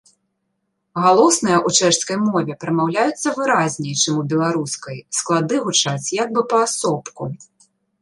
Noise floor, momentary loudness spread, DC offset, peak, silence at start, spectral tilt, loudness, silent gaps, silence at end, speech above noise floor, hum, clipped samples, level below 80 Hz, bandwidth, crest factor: -72 dBFS; 11 LU; under 0.1%; 0 dBFS; 0.95 s; -3.5 dB/octave; -18 LUFS; none; 0.6 s; 54 dB; none; under 0.1%; -64 dBFS; 11.5 kHz; 18 dB